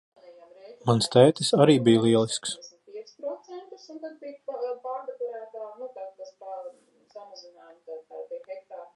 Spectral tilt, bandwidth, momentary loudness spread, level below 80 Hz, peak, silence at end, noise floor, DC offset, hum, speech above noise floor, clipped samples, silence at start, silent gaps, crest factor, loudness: -5.5 dB/octave; 11.5 kHz; 25 LU; -70 dBFS; -4 dBFS; 0.1 s; -50 dBFS; under 0.1%; none; 30 dB; under 0.1%; 0.3 s; none; 24 dB; -23 LUFS